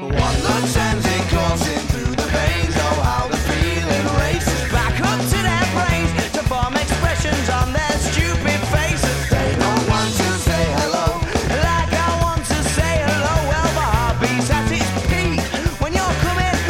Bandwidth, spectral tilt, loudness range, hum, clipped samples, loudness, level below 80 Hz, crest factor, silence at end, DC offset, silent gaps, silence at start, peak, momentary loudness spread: 16.5 kHz; -4.5 dB/octave; 1 LU; none; under 0.1%; -18 LUFS; -26 dBFS; 12 dB; 0 s; under 0.1%; none; 0 s; -6 dBFS; 2 LU